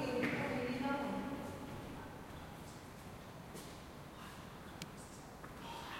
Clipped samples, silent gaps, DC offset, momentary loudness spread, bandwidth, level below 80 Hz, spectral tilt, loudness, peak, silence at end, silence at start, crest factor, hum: under 0.1%; none; under 0.1%; 14 LU; 16.5 kHz; -62 dBFS; -5.5 dB/octave; -45 LUFS; -22 dBFS; 0 s; 0 s; 22 dB; none